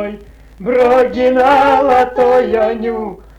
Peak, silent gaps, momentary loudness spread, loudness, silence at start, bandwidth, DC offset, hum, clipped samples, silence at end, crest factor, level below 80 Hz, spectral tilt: -4 dBFS; none; 11 LU; -12 LUFS; 0 s; 9 kHz; under 0.1%; none; under 0.1%; 0.2 s; 8 dB; -40 dBFS; -6 dB/octave